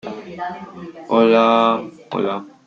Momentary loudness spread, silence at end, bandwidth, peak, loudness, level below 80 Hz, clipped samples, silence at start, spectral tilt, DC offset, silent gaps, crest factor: 20 LU; 0.2 s; 7.4 kHz; -2 dBFS; -17 LUFS; -64 dBFS; under 0.1%; 0.05 s; -6.5 dB/octave; under 0.1%; none; 18 dB